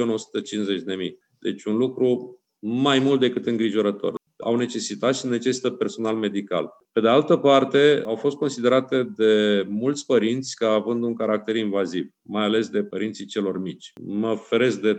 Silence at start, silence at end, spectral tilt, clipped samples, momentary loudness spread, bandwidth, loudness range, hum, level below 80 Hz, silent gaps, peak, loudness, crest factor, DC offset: 0 s; 0 s; -5 dB/octave; under 0.1%; 12 LU; 9 kHz; 5 LU; none; -78 dBFS; none; -4 dBFS; -23 LUFS; 18 dB; under 0.1%